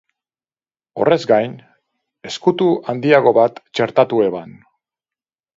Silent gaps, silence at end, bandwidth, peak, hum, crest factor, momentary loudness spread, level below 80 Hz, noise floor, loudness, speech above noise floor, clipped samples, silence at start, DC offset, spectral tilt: none; 1.05 s; 7.8 kHz; 0 dBFS; none; 18 dB; 13 LU; -64 dBFS; under -90 dBFS; -16 LUFS; over 74 dB; under 0.1%; 0.95 s; under 0.1%; -6 dB/octave